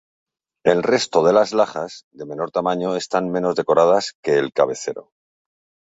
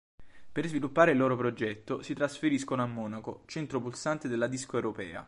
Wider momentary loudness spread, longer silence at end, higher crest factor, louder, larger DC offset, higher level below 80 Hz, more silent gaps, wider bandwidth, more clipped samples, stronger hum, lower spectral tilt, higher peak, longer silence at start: about the same, 14 LU vs 13 LU; first, 0.95 s vs 0 s; second, 18 dB vs 24 dB; first, -19 LUFS vs -31 LUFS; neither; about the same, -62 dBFS vs -66 dBFS; first, 2.04-2.11 s, 4.15-4.23 s vs none; second, 8 kHz vs 11.5 kHz; neither; neither; about the same, -4.5 dB/octave vs -5.5 dB/octave; first, -2 dBFS vs -8 dBFS; first, 0.65 s vs 0.2 s